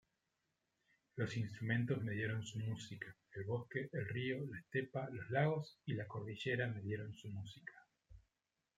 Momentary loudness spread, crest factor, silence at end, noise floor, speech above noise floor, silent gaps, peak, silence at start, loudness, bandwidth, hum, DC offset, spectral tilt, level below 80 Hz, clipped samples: 12 LU; 22 dB; 0.6 s; -89 dBFS; 47 dB; none; -22 dBFS; 1.15 s; -43 LUFS; 9.2 kHz; none; under 0.1%; -6.5 dB/octave; -76 dBFS; under 0.1%